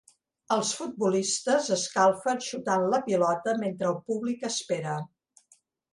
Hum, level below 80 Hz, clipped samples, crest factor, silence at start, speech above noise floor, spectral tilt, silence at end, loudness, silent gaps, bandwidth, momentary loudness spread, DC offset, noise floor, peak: none; -74 dBFS; under 0.1%; 18 dB; 0.5 s; 38 dB; -3.5 dB/octave; 0.9 s; -27 LUFS; none; 11.5 kHz; 7 LU; under 0.1%; -65 dBFS; -10 dBFS